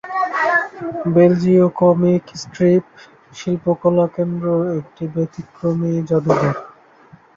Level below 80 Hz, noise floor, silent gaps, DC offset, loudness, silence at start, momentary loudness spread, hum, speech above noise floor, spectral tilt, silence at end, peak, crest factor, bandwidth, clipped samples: -56 dBFS; -47 dBFS; none; under 0.1%; -17 LUFS; 0.05 s; 12 LU; none; 31 dB; -8 dB/octave; 0.65 s; -2 dBFS; 16 dB; 7.4 kHz; under 0.1%